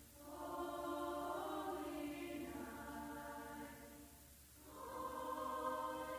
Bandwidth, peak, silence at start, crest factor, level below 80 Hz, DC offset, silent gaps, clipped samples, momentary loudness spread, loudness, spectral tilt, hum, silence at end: 16 kHz; -32 dBFS; 0 s; 16 dB; -68 dBFS; under 0.1%; none; under 0.1%; 14 LU; -47 LUFS; -4.5 dB/octave; none; 0 s